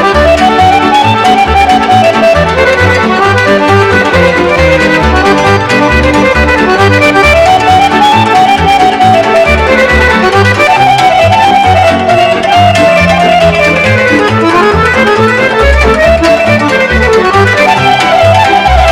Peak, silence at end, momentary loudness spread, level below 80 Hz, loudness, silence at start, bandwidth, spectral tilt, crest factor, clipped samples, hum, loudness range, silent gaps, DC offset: 0 dBFS; 0 s; 2 LU; -20 dBFS; -5 LUFS; 0 s; 18 kHz; -5 dB/octave; 6 dB; 9%; none; 1 LU; none; under 0.1%